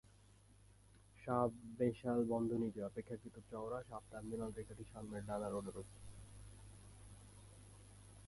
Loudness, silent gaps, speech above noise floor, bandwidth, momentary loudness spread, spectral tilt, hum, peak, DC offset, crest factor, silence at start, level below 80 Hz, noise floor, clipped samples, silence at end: -44 LUFS; none; 24 dB; 11.5 kHz; 21 LU; -7.5 dB/octave; 50 Hz at -60 dBFS; -22 dBFS; under 0.1%; 22 dB; 0.5 s; -64 dBFS; -66 dBFS; under 0.1%; 0 s